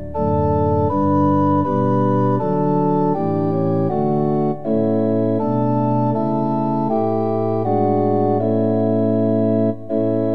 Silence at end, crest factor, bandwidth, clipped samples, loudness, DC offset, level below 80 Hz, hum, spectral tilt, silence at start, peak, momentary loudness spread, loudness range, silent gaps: 0 s; 12 dB; 5.2 kHz; under 0.1%; -18 LUFS; 2%; -48 dBFS; none; -11.5 dB/octave; 0 s; -4 dBFS; 3 LU; 1 LU; none